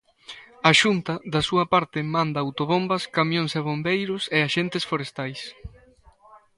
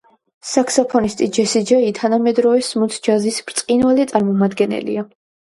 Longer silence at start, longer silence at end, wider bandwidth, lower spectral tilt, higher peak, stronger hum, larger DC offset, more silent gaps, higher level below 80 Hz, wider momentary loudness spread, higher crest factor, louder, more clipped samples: second, 0.3 s vs 0.45 s; second, 0.2 s vs 0.5 s; about the same, 11.5 kHz vs 11.5 kHz; about the same, -4.5 dB/octave vs -4.5 dB/octave; about the same, 0 dBFS vs 0 dBFS; neither; neither; neither; about the same, -54 dBFS vs -56 dBFS; first, 14 LU vs 7 LU; first, 24 dB vs 16 dB; second, -23 LUFS vs -17 LUFS; neither